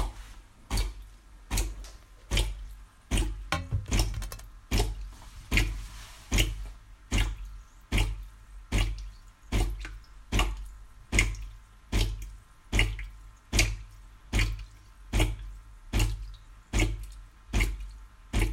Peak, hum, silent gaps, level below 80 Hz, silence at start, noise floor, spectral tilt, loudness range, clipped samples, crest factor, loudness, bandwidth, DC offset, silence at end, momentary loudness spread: -6 dBFS; none; none; -34 dBFS; 0 s; -50 dBFS; -3.5 dB/octave; 3 LU; under 0.1%; 24 dB; -32 LUFS; 16 kHz; under 0.1%; 0 s; 20 LU